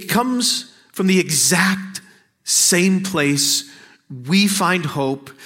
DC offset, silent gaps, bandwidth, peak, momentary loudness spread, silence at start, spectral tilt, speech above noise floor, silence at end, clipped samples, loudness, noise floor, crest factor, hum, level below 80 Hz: under 0.1%; none; 16.5 kHz; -2 dBFS; 14 LU; 0 s; -3 dB/octave; 24 dB; 0 s; under 0.1%; -17 LUFS; -41 dBFS; 18 dB; none; -62 dBFS